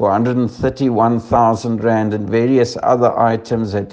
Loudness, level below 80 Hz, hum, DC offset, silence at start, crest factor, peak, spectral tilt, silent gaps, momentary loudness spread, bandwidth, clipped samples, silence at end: -16 LUFS; -44 dBFS; none; under 0.1%; 0 s; 14 dB; 0 dBFS; -7.5 dB/octave; none; 5 LU; 8.8 kHz; under 0.1%; 0 s